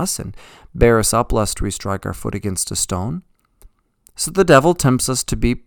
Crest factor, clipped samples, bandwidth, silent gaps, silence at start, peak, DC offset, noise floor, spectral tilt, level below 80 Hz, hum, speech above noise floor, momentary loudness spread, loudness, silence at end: 18 dB; under 0.1%; 19 kHz; none; 0 s; 0 dBFS; under 0.1%; -53 dBFS; -4.5 dB/octave; -30 dBFS; none; 36 dB; 14 LU; -17 LUFS; 0.1 s